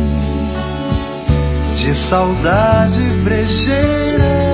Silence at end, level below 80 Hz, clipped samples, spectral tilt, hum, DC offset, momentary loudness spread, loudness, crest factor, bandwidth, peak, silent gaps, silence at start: 0 s; -22 dBFS; under 0.1%; -11.5 dB/octave; none; under 0.1%; 7 LU; -15 LUFS; 14 dB; 4 kHz; 0 dBFS; none; 0 s